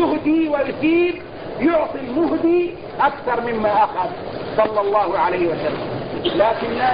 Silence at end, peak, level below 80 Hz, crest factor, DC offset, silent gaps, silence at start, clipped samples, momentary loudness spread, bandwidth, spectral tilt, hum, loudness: 0 s; -4 dBFS; -48 dBFS; 16 dB; 0.5%; none; 0 s; under 0.1%; 8 LU; 5.2 kHz; -11 dB/octave; none; -19 LUFS